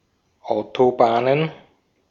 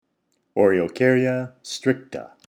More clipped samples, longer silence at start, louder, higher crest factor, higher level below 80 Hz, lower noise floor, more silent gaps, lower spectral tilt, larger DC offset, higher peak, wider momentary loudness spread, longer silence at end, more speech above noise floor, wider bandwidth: neither; about the same, 0.45 s vs 0.55 s; about the same, -20 LUFS vs -22 LUFS; about the same, 20 dB vs 18 dB; about the same, -64 dBFS vs -66 dBFS; second, -57 dBFS vs -71 dBFS; neither; first, -7.5 dB/octave vs -6 dB/octave; neither; about the same, -2 dBFS vs -4 dBFS; about the same, 11 LU vs 12 LU; first, 0.55 s vs 0.2 s; second, 39 dB vs 50 dB; second, 7.2 kHz vs 12.5 kHz